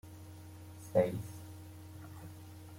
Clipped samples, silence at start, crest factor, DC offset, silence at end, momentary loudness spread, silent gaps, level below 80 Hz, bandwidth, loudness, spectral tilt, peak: under 0.1%; 0.05 s; 24 dB; under 0.1%; 0 s; 20 LU; none; -68 dBFS; 16.5 kHz; -35 LUFS; -7 dB/octave; -16 dBFS